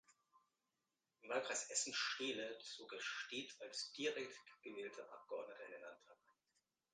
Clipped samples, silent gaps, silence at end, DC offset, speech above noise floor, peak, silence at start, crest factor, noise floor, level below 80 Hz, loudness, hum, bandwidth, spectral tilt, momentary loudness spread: under 0.1%; none; 0.8 s; under 0.1%; over 42 dB; -28 dBFS; 0.1 s; 22 dB; under -90 dBFS; under -90 dBFS; -46 LUFS; none; 10 kHz; -0.5 dB/octave; 16 LU